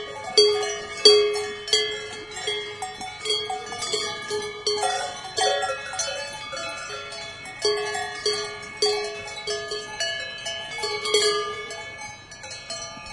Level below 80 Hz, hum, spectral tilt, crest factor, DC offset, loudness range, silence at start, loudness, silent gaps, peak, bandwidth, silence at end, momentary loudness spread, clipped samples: -60 dBFS; none; -0.5 dB/octave; 26 dB; under 0.1%; 5 LU; 0 s; -24 LUFS; none; 0 dBFS; 11.5 kHz; 0 s; 14 LU; under 0.1%